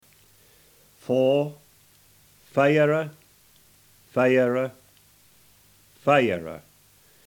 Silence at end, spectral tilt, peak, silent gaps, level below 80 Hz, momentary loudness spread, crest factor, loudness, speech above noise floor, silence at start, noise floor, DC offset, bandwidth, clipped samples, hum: 0.7 s; -6.5 dB/octave; -4 dBFS; none; -68 dBFS; 15 LU; 22 dB; -23 LUFS; 36 dB; 1.1 s; -57 dBFS; under 0.1%; 19 kHz; under 0.1%; none